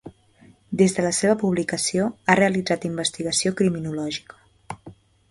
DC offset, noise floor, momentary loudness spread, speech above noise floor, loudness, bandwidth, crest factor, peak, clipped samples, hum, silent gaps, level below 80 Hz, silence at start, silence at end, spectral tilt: under 0.1%; -54 dBFS; 14 LU; 32 dB; -22 LUFS; 11.5 kHz; 24 dB; 0 dBFS; under 0.1%; none; none; -58 dBFS; 0.05 s; 0.4 s; -4 dB/octave